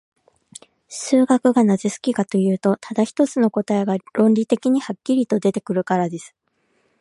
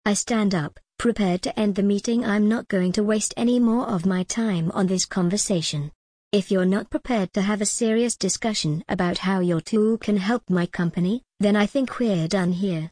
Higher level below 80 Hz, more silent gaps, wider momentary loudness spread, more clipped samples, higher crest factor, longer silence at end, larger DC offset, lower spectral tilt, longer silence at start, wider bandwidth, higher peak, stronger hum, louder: second, -70 dBFS vs -52 dBFS; second, none vs 5.95-6.31 s; first, 7 LU vs 4 LU; neither; about the same, 16 dB vs 14 dB; first, 0.75 s vs 0.05 s; neither; first, -6.5 dB/octave vs -5 dB/octave; first, 0.9 s vs 0.05 s; about the same, 11.5 kHz vs 10.5 kHz; first, -4 dBFS vs -8 dBFS; neither; first, -19 LUFS vs -23 LUFS